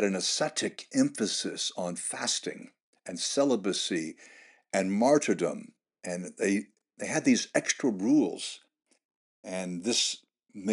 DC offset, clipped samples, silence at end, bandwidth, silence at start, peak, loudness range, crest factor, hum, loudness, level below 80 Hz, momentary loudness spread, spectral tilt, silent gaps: under 0.1%; under 0.1%; 0 s; 11.5 kHz; 0 s; -10 dBFS; 2 LU; 20 dB; none; -29 LUFS; -86 dBFS; 15 LU; -3 dB/octave; 2.83-2.93 s, 9.05-9.09 s, 9.16-9.43 s